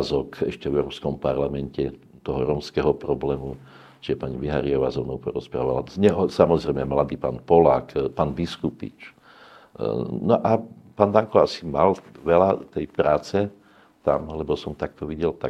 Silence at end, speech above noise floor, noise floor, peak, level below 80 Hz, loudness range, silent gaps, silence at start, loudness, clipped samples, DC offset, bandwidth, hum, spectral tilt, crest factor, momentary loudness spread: 0 s; 26 dB; -49 dBFS; 0 dBFS; -46 dBFS; 5 LU; none; 0 s; -23 LUFS; under 0.1%; under 0.1%; 10 kHz; none; -7.5 dB/octave; 22 dB; 11 LU